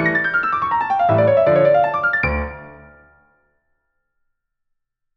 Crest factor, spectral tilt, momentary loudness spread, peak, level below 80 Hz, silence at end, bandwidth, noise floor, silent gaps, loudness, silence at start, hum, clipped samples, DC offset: 16 dB; -8.5 dB/octave; 9 LU; -4 dBFS; -38 dBFS; 2.4 s; 6 kHz; -74 dBFS; none; -16 LUFS; 0 s; none; under 0.1%; under 0.1%